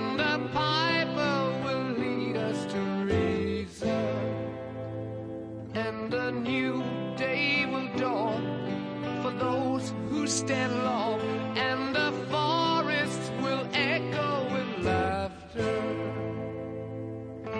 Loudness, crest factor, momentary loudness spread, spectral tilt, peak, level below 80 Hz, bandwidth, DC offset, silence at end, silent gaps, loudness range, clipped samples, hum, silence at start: -30 LUFS; 18 dB; 10 LU; -5 dB/octave; -12 dBFS; -58 dBFS; 11 kHz; under 0.1%; 0 s; none; 4 LU; under 0.1%; none; 0 s